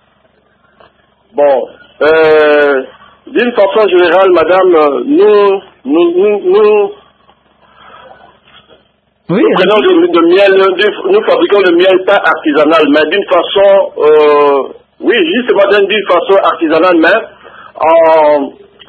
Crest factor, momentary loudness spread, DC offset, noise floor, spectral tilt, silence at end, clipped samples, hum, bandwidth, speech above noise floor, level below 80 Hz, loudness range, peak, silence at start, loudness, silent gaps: 8 dB; 8 LU; under 0.1%; -53 dBFS; -6.5 dB/octave; 0.4 s; 0.2%; none; 5.6 kHz; 45 dB; -52 dBFS; 5 LU; 0 dBFS; 1.35 s; -8 LUFS; none